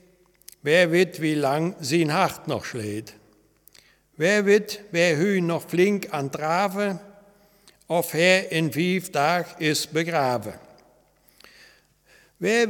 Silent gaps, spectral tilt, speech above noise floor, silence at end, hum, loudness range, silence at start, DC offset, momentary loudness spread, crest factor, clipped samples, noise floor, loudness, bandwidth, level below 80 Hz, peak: none; -4.5 dB/octave; 37 dB; 0 s; none; 4 LU; 0.65 s; under 0.1%; 11 LU; 20 dB; under 0.1%; -60 dBFS; -23 LUFS; 19 kHz; -68 dBFS; -4 dBFS